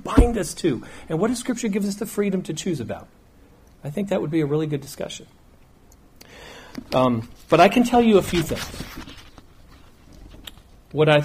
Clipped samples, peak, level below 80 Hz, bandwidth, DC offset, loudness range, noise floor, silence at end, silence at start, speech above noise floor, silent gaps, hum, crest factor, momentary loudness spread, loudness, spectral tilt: under 0.1%; -4 dBFS; -36 dBFS; 15.5 kHz; under 0.1%; 8 LU; -51 dBFS; 0 s; 0.05 s; 30 dB; none; none; 20 dB; 23 LU; -22 LUFS; -5.5 dB/octave